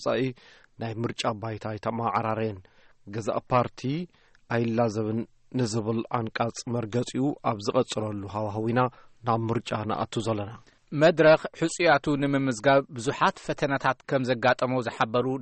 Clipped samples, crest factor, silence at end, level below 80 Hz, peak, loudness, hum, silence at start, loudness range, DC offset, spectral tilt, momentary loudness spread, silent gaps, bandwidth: under 0.1%; 18 dB; 0 s; -60 dBFS; -10 dBFS; -27 LUFS; none; 0 s; 6 LU; under 0.1%; -6 dB/octave; 11 LU; none; 8.8 kHz